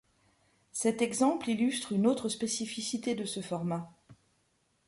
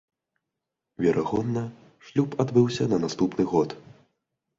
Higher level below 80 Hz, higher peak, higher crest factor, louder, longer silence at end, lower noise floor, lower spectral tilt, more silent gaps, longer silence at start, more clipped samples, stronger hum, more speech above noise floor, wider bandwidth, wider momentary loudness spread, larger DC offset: second, -72 dBFS vs -58 dBFS; second, -16 dBFS vs -8 dBFS; about the same, 18 dB vs 20 dB; second, -32 LUFS vs -25 LUFS; about the same, 0.75 s vs 0.8 s; second, -74 dBFS vs -85 dBFS; second, -4.5 dB/octave vs -7 dB/octave; neither; second, 0.75 s vs 1 s; neither; neither; second, 42 dB vs 60 dB; first, 11.5 kHz vs 7.8 kHz; about the same, 8 LU vs 9 LU; neither